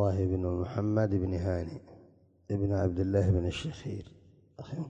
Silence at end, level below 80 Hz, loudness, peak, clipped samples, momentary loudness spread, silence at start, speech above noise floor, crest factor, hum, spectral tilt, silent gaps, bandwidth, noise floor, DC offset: 0 s; -42 dBFS; -31 LUFS; -14 dBFS; under 0.1%; 14 LU; 0 s; 30 dB; 16 dB; none; -8 dB/octave; none; 8.2 kHz; -60 dBFS; under 0.1%